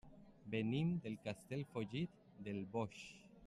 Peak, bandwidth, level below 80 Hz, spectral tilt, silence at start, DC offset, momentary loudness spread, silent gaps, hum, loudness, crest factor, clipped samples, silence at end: -28 dBFS; 12.5 kHz; -72 dBFS; -7 dB/octave; 0.05 s; under 0.1%; 16 LU; none; none; -44 LUFS; 16 dB; under 0.1%; 0 s